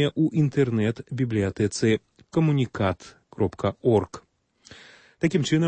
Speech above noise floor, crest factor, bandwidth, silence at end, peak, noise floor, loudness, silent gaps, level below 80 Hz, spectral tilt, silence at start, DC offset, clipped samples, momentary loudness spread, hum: 29 dB; 16 dB; 8.8 kHz; 0 s; -8 dBFS; -52 dBFS; -25 LUFS; none; -56 dBFS; -6.5 dB/octave; 0 s; under 0.1%; under 0.1%; 7 LU; none